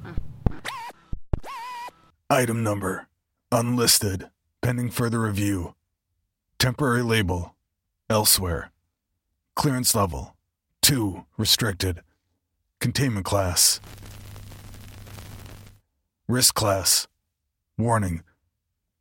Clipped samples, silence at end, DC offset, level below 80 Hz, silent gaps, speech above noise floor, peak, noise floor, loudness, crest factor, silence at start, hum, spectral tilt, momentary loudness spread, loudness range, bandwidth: under 0.1%; 0.8 s; under 0.1%; -42 dBFS; none; 56 dB; -2 dBFS; -79 dBFS; -23 LUFS; 24 dB; 0 s; none; -3.5 dB/octave; 24 LU; 3 LU; 17 kHz